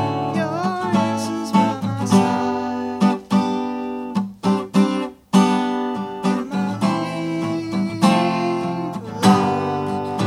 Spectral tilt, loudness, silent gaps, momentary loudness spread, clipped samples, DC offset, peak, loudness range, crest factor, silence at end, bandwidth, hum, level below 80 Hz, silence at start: -6 dB/octave; -20 LUFS; none; 8 LU; under 0.1%; under 0.1%; -2 dBFS; 1 LU; 18 dB; 0 s; 13.5 kHz; none; -60 dBFS; 0 s